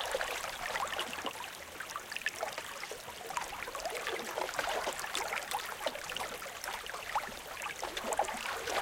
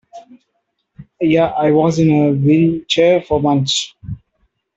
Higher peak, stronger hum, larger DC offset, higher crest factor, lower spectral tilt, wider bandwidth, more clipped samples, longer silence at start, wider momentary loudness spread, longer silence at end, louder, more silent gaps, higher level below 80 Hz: second, -16 dBFS vs 0 dBFS; neither; neither; first, 22 dB vs 14 dB; second, -1 dB/octave vs -6 dB/octave; first, 17 kHz vs 8.2 kHz; neither; second, 0 s vs 0.15 s; second, 7 LU vs 13 LU; second, 0 s vs 0.6 s; second, -38 LUFS vs -14 LUFS; neither; second, -62 dBFS vs -46 dBFS